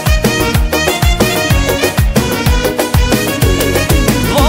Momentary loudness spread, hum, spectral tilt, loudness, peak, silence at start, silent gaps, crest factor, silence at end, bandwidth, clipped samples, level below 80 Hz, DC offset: 2 LU; none; -4.5 dB/octave; -12 LUFS; 0 dBFS; 0 s; none; 12 dB; 0 s; 16.5 kHz; under 0.1%; -16 dBFS; under 0.1%